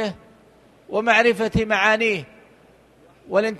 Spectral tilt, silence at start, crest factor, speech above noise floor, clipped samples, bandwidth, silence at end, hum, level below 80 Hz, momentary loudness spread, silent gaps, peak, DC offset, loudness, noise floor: -5 dB/octave; 0 s; 20 dB; 33 dB; under 0.1%; 12.5 kHz; 0 s; none; -46 dBFS; 12 LU; none; -2 dBFS; under 0.1%; -19 LUFS; -53 dBFS